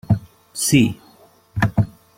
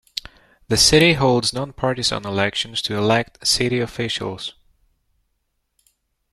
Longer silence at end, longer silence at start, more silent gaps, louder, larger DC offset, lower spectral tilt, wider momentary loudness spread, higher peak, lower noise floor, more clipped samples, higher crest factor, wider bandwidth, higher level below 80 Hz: second, 0.3 s vs 1.8 s; second, 0.1 s vs 0.7 s; neither; about the same, -19 LUFS vs -18 LUFS; neither; first, -5 dB/octave vs -3.5 dB/octave; first, 17 LU vs 14 LU; about the same, -2 dBFS vs -2 dBFS; second, -51 dBFS vs -72 dBFS; neither; about the same, 20 dB vs 20 dB; about the same, 16.5 kHz vs 15 kHz; about the same, -42 dBFS vs -44 dBFS